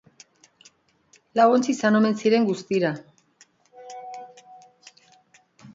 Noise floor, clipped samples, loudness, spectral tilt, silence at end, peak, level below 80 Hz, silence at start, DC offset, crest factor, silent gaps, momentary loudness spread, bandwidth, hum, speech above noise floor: -61 dBFS; under 0.1%; -21 LUFS; -5.5 dB/octave; 0.1 s; -6 dBFS; -74 dBFS; 1.35 s; under 0.1%; 20 dB; none; 22 LU; 7.8 kHz; none; 40 dB